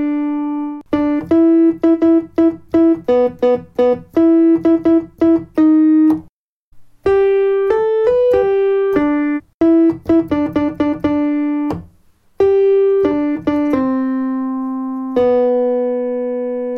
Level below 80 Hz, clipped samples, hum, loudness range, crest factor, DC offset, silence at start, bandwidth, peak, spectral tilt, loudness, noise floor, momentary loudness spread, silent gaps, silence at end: -48 dBFS; under 0.1%; none; 3 LU; 12 dB; under 0.1%; 0 s; 5.6 kHz; -2 dBFS; -8.5 dB/octave; -15 LUFS; -51 dBFS; 8 LU; 6.29-6.72 s, 9.54-9.60 s; 0 s